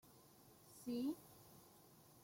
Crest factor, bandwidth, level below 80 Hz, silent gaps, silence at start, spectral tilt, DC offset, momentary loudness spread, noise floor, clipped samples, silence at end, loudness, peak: 18 dB; 16.5 kHz; -82 dBFS; none; 0.05 s; -5.5 dB/octave; under 0.1%; 21 LU; -67 dBFS; under 0.1%; 0.05 s; -47 LUFS; -34 dBFS